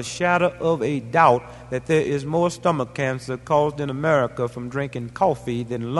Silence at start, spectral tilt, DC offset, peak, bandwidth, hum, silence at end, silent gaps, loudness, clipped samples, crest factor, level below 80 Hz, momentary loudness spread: 0 s; -6 dB/octave; under 0.1%; -2 dBFS; 11.5 kHz; none; 0 s; none; -22 LUFS; under 0.1%; 20 dB; -52 dBFS; 10 LU